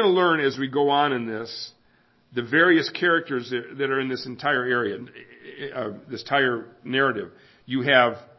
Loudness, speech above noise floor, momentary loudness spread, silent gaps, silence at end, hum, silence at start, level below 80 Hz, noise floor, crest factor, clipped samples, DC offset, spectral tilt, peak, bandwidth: -23 LUFS; 38 dB; 17 LU; none; 0.15 s; none; 0 s; -70 dBFS; -61 dBFS; 22 dB; under 0.1%; under 0.1%; -6 dB/octave; -2 dBFS; 6 kHz